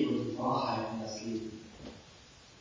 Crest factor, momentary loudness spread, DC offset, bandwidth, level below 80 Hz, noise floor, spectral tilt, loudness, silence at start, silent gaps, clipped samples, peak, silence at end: 16 dB; 22 LU; under 0.1%; 7.6 kHz; -64 dBFS; -56 dBFS; -5.5 dB/octave; -35 LUFS; 0 s; none; under 0.1%; -20 dBFS; 0 s